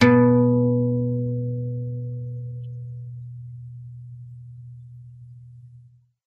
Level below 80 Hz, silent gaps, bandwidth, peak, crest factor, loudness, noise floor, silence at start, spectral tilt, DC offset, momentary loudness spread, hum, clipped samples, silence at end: -58 dBFS; none; 6.6 kHz; 0 dBFS; 22 dB; -23 LUFS; -52 dBFS; 0 s; -8.5 dB/octave; under 0.1%; 26 LU; none; under 0.1%; 0.5 s